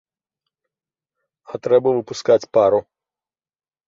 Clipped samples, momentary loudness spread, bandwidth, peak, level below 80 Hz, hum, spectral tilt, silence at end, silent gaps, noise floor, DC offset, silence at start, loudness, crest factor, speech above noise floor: under 0.1%; 10 LU; 7.6 kHz; -4 dBFS; -62 dBFS; none; -5.5 dB/octave; 1.05 s; none; under -90 dBFS; under 0.1%; 1.5 s; -18 LUFS; 18 dB; over 73 dB